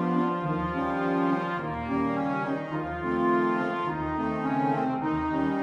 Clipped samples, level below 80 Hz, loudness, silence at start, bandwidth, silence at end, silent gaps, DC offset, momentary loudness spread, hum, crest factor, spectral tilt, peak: under 0.1%; -50 dBFS; -28 LUFS; 0 s; 7.4 kHz; 0 s; none; under 0.1%; 5 LU; none; 14 dB; -8.5 dB/octave; -14 dBFS